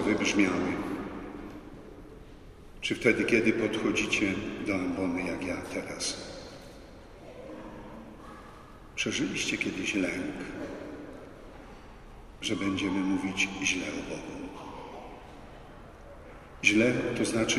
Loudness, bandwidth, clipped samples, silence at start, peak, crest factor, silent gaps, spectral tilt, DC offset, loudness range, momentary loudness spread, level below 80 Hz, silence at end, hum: -29 LUFS; 13 kHz; under 0.1%; 0 s; -8 dBFS; 24 dB; none; -4 dB/octave; under 0.1%; 8 LU; 24 LU; -54 dBFS; 0 s; none